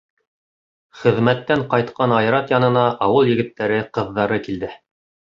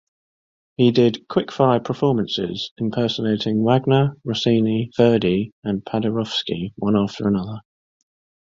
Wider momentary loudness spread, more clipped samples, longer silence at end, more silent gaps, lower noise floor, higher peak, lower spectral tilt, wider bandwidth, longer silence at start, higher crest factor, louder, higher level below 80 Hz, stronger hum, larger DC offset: about the same, 7 LU vs 9 LU; neither; second, 0.65 s vs 0.9 s; second, none vs 2.71-2.76 s, 5.52-5.62 s; about the same, under -90 dBFS vs under -90 dBFS; about the same, -2 dBFS vs -2 dBFS; about the same, -8 dB/octave vs -7 dB/octave; about the same, 7.4 kHz vs 7.6 kHz; first, 0.95 s vs 0.8 s; about the same, 18 dB vs 18 dB; about the same, -18 LUFS vs -20 LUFS; about the same, -54 dBFS vs -54 dBFS; neither; neither